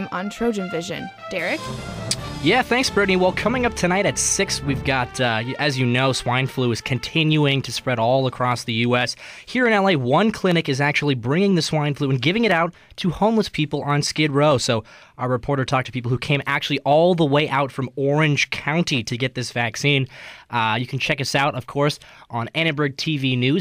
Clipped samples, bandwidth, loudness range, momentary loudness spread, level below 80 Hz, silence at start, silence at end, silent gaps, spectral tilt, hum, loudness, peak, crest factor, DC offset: under 0.1%; 15.5 kHz; 2 LU; 8 LU; -46 dBFS; 0 s; 0 s; none; -4.5 dB/octave; none; -20 LUFS; -6 dBFS; 16 dB; under 0.1%